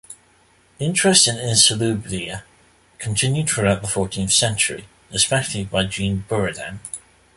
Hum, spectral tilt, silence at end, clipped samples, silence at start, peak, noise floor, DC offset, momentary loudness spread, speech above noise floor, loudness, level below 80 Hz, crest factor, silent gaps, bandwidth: none; -3 dB/octave; 0.35 s; under 0.1%; 0.1 s; 0 dBFS; -56 dBFS; under 0.1%; 17 LU; 36 dB; -18 LUFS; -46 dBFS; 22 dB; none; 12 kHz